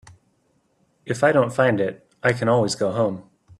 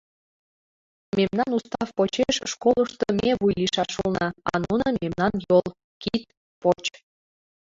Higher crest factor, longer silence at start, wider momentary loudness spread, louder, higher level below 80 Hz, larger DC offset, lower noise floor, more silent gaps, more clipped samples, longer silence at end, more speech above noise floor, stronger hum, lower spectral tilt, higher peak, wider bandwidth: about the same, 18 dB vs 18 dB; about the same, 1.05 s vs 1.15 s; about the same, 9 LU vs 7 LU; first, -21 LUFS vs -24 LUFS; second, -60 dBFS vs -52 dBFS; neither; second, -66 dBFS vs under -90 dBFS; second, none vs 5.84-6.00 s, 6.37-6.62 s; neither; second, 0.4 s vs 0.85 s; second, 46 dB vs over 67 dB; neither; about the same, -5.5 dB/octave vs -5 dB/octave; about the same, -4 dBFS vs -6 dBFS; first, 12.5 kHz vs 7.8 kHz